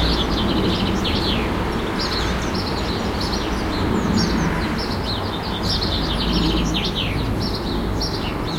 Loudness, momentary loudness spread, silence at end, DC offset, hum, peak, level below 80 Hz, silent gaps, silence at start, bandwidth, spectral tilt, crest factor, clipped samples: -21 LUFS; 4 LU; 0 s; under 0.1%; none; -6 dBFS; -28 dBFS; none; 0 s; 16.5 kHz; -5 dB/octave; 14 dB; under 0.1%